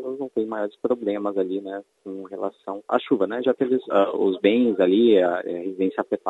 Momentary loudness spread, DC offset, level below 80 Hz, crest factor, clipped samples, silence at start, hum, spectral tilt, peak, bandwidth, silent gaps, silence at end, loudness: 14 LU; under 0.1%; -74 dBFS; 18 dB; under 0.1%; 0 s; none; -7.5 dB/octave; -4 dBFS; 7.6 kHz; none; 0 s; -23 LUFS